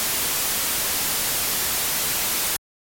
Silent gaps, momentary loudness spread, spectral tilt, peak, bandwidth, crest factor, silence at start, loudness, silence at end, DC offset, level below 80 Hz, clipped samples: none; 1 LU; 0 dB/octave; -12 dBFS; 17 kHz; 12 dB; 0 s; -21 LUFS; 0.35 s; under 0.1%; -48 dBFS; under 0.1%